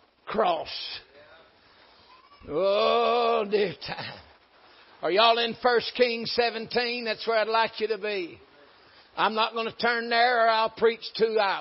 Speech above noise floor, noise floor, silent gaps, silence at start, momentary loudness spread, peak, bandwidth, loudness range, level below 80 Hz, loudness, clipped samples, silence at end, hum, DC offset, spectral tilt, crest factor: 32 dB; -57 dBFS; none; 0.25 s; 12 LU; -8 dBFS; 5.8 kHz; 3 LU; -66 dBFS; -25 LUFS; under 0.1%; 0 s; none; under 0.1%; -0.5 dB/octave; 20 dB